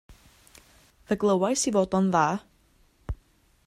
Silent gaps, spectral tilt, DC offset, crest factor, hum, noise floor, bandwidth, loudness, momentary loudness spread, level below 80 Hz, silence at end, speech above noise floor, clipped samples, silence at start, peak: none; -5 dB/octave; under 0.1%; 18 dB; none; -62 dBFS; 14 kHz; -25 LUFS; 17 LU; -48 dBFS; 0.55 s; 39 dB; under 0.1%; 0.1 s; -10 dBFS